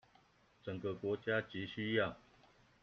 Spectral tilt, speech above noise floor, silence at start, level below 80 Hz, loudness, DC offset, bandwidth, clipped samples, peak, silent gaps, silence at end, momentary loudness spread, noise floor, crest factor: -4 dB/octave; 31 dB; 0.65 s; -72 dBFS; -40 LUFS; under 0.1%; 6.8 kHz; under 0.1%; -18 dBFS; none; 0.65 s; 12 LU; -70 dBFS; 22 dB